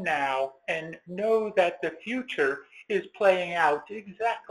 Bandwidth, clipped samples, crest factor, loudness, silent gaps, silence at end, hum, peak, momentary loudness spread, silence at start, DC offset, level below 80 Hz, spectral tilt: 12 kHz; under 0.1%; 20 dB; -27 LUFS; none; 0.1 s; none; -8 dBFS; 9 LU; 0 s; under 0.1%; -70 dBFS; -5 dB/octave